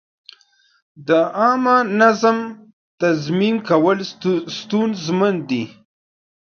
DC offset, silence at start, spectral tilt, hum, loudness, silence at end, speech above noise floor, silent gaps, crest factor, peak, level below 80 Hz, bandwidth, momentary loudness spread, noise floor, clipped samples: under 0.1%; 1 s; -6 dB/octave; none; -18 LUFS; 0.85 s; 36 dB; 2.73-2.98 s; 18 dB; 0 dBFS; -66 dBFS; 7 kHz; 10 LU; -54 dBFS; under 0.1%